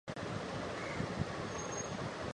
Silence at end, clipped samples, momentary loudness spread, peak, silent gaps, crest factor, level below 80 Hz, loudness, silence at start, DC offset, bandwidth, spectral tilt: 0 s; under 0.1%; 2 LU; -24 dBFS; none; 18 dB; -56 dBFS; -40 LUFS; 0.05 s; under 0.1%; 11.5 kHz; -4.5 dB/octave